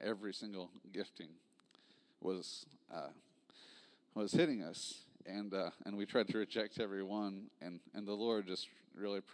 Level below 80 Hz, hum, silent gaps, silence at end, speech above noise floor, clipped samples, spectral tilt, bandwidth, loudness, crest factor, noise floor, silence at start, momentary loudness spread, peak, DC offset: under -90 dBFS; none; none; 0 s; 29 dB; under 0.1%; -5 dB/octave; 11 kHz; -42 LUFS; 24 dB; -70 dBFS; 0 s; 15 LU; -20 dBFS; under 0.1%